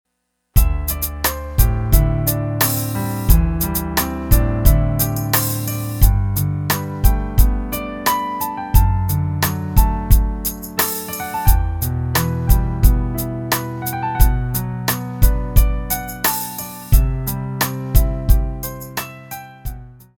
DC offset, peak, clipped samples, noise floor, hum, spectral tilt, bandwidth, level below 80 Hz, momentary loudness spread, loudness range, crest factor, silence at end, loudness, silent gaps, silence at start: under 0.1%; 0 dBFS; under 0.1%; -72 dBFS; none; -5 dB/octave; over 20 kHz; -20 dBFS; 7 LU; 2 LU; 16 dB; 0.25 s; -19 LUFS; none; 0.55 s